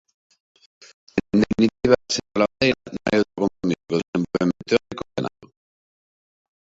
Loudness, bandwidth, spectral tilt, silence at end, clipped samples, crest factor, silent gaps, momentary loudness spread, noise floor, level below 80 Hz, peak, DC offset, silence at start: -22 LUFS; 7.8 kHz; -5.5 dB/octave; 1.25 s; under 0.1%; 22 dB; 4.08-4.13 s; 9 LU; under -90 dBFS; -50 dBFS; -2 dBFS; under 0.1%; 1.15 s